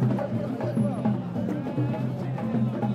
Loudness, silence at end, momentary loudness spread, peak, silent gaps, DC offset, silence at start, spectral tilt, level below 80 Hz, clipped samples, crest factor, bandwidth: -28 LUFS; 0 s; 4 LU; -14 dBFS; none; under 0.1%; 0 s; -9.5 dB/octave; -60 dBFS; under 0.1%; 14 dB; 11 kHz